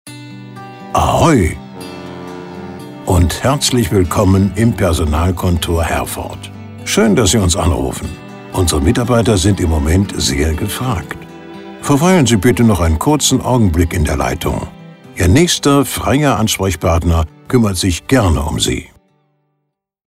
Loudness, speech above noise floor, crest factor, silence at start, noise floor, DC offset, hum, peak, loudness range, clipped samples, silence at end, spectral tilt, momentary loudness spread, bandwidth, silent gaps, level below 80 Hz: -14 LUFS; 59 dB; 14 dB; 0.05 s; -71 dBFS; under 0.1%; none; 0 dBFS; 3 LU; under 0.1%; 1.25 s; -5 dB/octave; 18 LU; 16 kHz; none; -26 dBFS